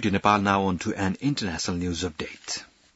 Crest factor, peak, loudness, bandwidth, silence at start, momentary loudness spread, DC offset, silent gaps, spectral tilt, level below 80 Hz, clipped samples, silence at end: 20 dB; -6 dBFS; -26 LUFS; 8 kHz; 0 s; 12 LU; under 0.1%; none; -4.5 dB/octave; -54 dBFS; under 0.1%; 0.3 s